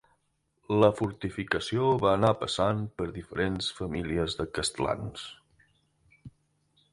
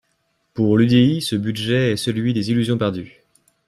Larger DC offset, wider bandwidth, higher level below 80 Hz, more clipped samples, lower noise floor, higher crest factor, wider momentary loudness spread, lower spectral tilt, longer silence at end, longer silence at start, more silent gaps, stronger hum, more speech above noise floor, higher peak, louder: neither; second, 11.5 kHz vs 13.5 kHz; about the same, -50 dBFS vs -54 dBFS; neither; first, -74 dBFS vs -68 dBFS; first, 22 dB vs 16 dB; first, 11 LU vs 8 LU; about the same, -5.5 dB/octave vs -6.5 dB/octave; about the same, 0.65 s vs 0.6 s; first, 0.7 s vs 0.55 s; neither; neither; second, 46 dB vs 50 dB; second, -8 dBFS vs -4 dBFS; second, -29 LUFS vs -19 LUFS